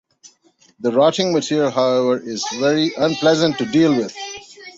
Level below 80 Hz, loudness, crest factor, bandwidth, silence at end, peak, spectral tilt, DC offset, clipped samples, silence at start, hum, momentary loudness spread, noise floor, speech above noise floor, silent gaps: -62 dBFS; -18 LUFS; 16 dB; 8 kHz; 0.05 s; -2 dBFS; -5 dB/octave; under 0.1%; under 0.1%; 0.8 s; none; 10 LU; -56 dBFS; 39 dB; none